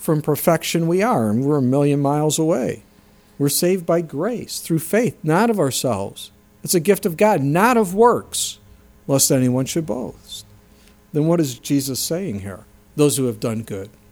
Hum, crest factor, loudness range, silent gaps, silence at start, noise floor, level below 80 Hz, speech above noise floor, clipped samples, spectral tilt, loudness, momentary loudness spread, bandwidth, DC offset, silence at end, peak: none; 18 dB; 4 LU; none; 0 s; -51 dBFS; -54 dBFS; 32 dB; under 0.1%; -5 dB/octave; -19 LUFS; 16 LU; over 20 kHz; under 0.1%; 0.2 s; -2 dBFS